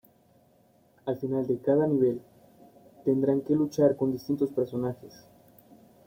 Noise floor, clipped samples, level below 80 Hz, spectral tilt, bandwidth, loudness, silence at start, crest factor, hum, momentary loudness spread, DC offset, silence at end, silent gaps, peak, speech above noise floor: -63 dBFS; under 0.1%; -68 dBFS; -8.5 dB/octave; 16.5 kHz; -28 LUFS; 1.05 s; 18 dB; none; 10 LU; under 0.1%; 1 s; none; -10 dBFS; 36 dB